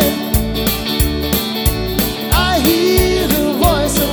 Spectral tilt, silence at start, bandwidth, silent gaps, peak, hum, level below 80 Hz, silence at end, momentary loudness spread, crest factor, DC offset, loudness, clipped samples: -4.5 dB/octave; 0 s; over 20 kHz; none; 0 dBFS; none; -22 dBFS; 0 s; 5 LU; 14 dB; under 0.1%; -15 LUFS; under 0.1%